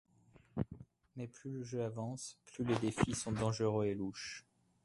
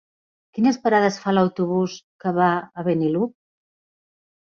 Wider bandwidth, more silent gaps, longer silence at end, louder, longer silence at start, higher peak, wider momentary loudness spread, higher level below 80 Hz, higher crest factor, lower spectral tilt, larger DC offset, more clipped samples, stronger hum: first, 11.5 kHz vs 7.2 kHz; second, none vs 2.04-2.19 s; second, 0.45 s vs 1.25 s; second, -40 LUFS vs -21 LUFS; about the same, 0.55 s vs 0.55 s; second, -18 dBFS vs -4 dBFS; first, 14 LU vs 9 LU; first, -60 dBFS vs -66 dBFS; about the same, 22 dB vs 18 dB; about the same, -5.5 dB/octave vs -6.5 dB/octave; neither; neither; neither